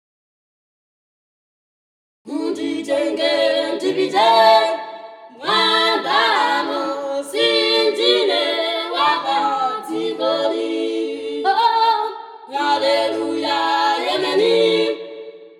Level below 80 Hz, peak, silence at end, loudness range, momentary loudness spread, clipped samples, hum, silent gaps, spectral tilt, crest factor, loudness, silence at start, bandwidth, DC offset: -78 dBFS; 0 dBFS; 0.1 s; 5 LU; 10 LU; under 0.1%; none; none; -3 dB/octave; 18 dB; -18 LUFS; 2.25 s; 14 kHz; under 0.1%